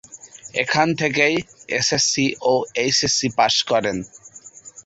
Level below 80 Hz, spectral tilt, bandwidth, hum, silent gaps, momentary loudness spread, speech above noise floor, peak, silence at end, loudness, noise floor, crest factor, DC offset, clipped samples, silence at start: -56 dBFS; -2.5 dB/octave; 8.2 kHz; none; none; 19 LU; 24 dB; -4 dBFS; 0.05 s; -19 LUFS; -44 dBFS; 18 dB; under 0.1%; under 0.1%; 0.1 s